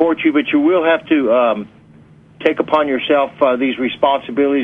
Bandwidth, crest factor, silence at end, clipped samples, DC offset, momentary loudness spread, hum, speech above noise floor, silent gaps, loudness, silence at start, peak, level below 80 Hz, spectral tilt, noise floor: 4.4 kHz; 14 dB; 0 s; under 0.1%; under 0.1%; 5 LU; none; 30 dB; none; -15 LUFS; 0 s; 0 dBFS; -58 dBFS; -7 dB/octave; -44 dBFS